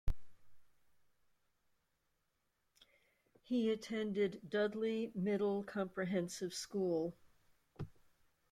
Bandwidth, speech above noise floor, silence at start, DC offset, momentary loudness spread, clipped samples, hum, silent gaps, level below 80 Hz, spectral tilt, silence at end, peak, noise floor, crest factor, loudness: 14.5 kHz; 46 dB; 0.05 s; under 0.1%; 14 LU; under 0.1%; none; none; -54 dBFS; -5.5 dB/octave; 0.6 s; -22 dBFS; -84 dBFS; 18 dB; -39 LUFS